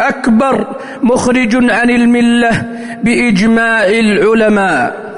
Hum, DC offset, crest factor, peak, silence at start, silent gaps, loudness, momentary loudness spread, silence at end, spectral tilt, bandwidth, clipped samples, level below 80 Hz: none; under 0.1%; 8 dB; -2 dBFS; 0 s; none; -10 LUFS; 7 LU; 0 s; -5.5 dB/octave; 11 kHz; under 0.1%; -40 dBFS